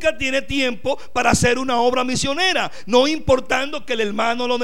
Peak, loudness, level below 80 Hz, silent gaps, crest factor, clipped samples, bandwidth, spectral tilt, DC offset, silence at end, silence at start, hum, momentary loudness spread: -2 dBFS; -19 LUFS; -40 dBFS; none; 18 dB; under 0.1%; 16 kHz; -3.5 dB/octave; 4%; 0 s; 0 s; none; 6 LU